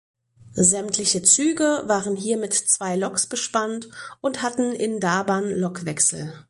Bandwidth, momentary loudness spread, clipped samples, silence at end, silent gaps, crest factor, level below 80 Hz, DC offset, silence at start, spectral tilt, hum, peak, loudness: 11.5 kHz; 10 LU; under 0.1%; 0.1 s; none; 20 dB; -60 dBFS; under 0.1%; 0.45 s; -3 dB/octave; none; -4 dBFS; -21 LUFS